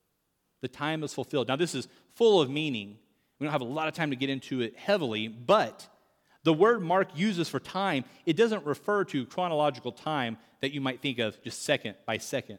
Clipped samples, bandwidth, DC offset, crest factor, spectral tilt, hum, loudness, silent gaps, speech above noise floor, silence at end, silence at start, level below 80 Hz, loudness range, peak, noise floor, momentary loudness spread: under 0.1%; 17.5 kHz; under 0.1%; 20 dB; -5 dB/octave; none; -29 LUFS; none; 48 dB; 0 s; 0.65 s; -76 dBFS; 3 LU; -10 dBFS; -77 dBFS; 11 LU